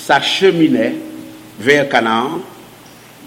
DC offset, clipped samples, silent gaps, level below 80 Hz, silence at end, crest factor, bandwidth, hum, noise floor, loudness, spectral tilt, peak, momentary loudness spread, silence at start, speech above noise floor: under 0.1%; under 0.1%; none; -60 dBFS; 0 s; 16 dB; 16.5 kHz; none; -40 dBFS; -14 LUFS; -4.5 dB/octave; 0 dBFS; 21 LU; 0 s; 26 dB